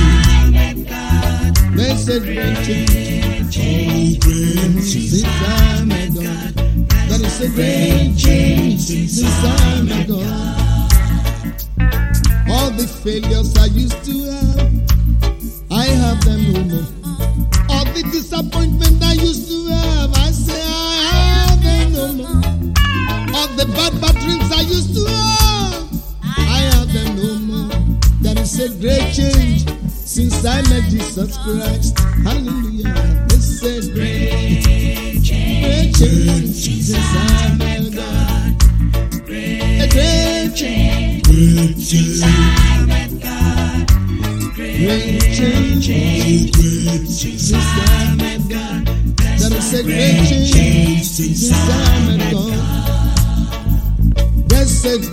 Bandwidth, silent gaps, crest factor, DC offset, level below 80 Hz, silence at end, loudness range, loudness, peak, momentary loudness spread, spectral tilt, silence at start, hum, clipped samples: 16.5 kHz; none; 14 dB; under 0.1%; -16 dBFS; 0 s; 3 LU; -15 LUFS; 0 dBFS; 7 LU; -5 dB/octave; 0 s; none; under 0.1%